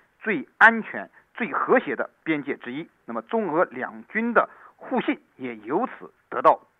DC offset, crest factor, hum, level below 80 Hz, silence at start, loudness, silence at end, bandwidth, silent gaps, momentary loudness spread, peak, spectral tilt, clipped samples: under 0.1%; 22 dB; none; -76 dBFS; 0.25 s; -24 LUFS; 0.25 s; 9.6 kHz; none; 18 LU; -4 dBFS; -7 dB/octave; under 0.1%